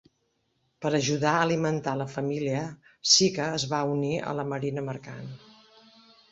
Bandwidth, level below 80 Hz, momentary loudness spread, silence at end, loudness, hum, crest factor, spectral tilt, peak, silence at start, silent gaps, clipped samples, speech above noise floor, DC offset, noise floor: 8 kHz; -66 dBFS; 17 LU; 0.95 s; -26 LUFS; none; 22 dB; -3.5 dB/octave; -8 dBFS; 0.8 s; none; under 0.1%; 47 dB; under 0.1%; -74 dBFS